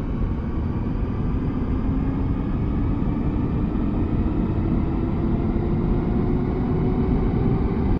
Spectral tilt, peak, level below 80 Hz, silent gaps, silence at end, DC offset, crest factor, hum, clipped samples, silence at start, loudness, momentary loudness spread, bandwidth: -11 dB/octave; -8 dBFS; -26 dBFS; none; 0 s; under 0.1%; 14 dB; none; under 0.1%; 0 s; -24 LUFS; 4 LU; 5.2 kHz